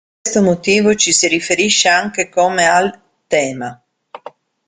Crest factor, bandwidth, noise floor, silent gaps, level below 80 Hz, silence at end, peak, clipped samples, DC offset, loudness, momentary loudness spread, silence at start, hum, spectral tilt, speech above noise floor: 16 dB; 9.8 kHz; -39 dBFS; none; -54 dBFS; 0.4 s; 0 dBFS; under 0.1%; under 0.1%; -13 LUFS; 9 LU; 0.25 s; none; -2.5 dB/octave; 24 dB